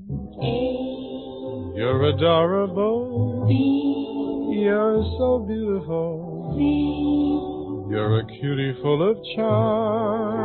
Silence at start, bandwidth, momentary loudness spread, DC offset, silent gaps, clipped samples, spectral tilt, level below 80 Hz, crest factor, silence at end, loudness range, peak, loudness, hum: 0 s; 4.4 kHz; 11 LU; under 0.1%; none; under 0.1%; -12 dB/octave; -44 dBFS; 16 dB; 0 s; 2 LU; -6 dBFS; -23 LUFS; none